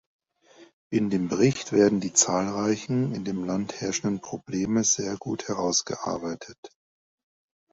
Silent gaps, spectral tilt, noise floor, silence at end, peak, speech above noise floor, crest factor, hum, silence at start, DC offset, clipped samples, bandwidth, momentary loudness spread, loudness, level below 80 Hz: 0.73-0.90 s, 6.58-6.63 s; -4 dB/octave; -55 dBFS; 1.05 s; -6 dBFS; 29 dB; 22 dB; none; 0.6 s; under 0.1%; under 0.1%; 8 kHz; 11 LU; -26 LUFS; -60 dBFS